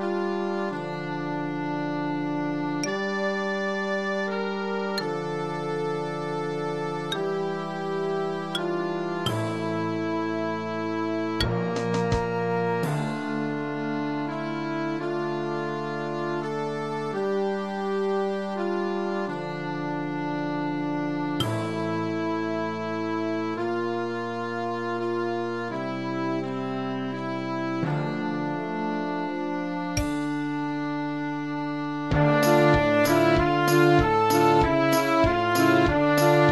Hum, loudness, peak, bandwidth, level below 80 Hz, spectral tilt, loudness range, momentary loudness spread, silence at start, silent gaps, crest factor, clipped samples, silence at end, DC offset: none; -26 LUFS; -8 dBFS; 13 kHz; -46 dBFS; -6 dB/octave; 8 LU; 9 LU; 0 s; none; 18 dB; under 0.1%; 0 s; 0.3%